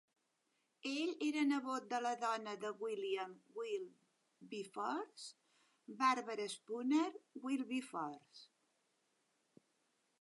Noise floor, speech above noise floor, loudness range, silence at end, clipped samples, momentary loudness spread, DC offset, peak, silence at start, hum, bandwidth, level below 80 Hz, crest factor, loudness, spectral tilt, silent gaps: -83 dBFS; 42 dB; 5 LU; 1.75 s; under 0.1%; 15 LU; under 0.1%; -22 dBFS; 0.85 s; none; 11.5 kHz; under -90 dBFS; 22 dB; -41 LUFS; -3.5 dB/octave; none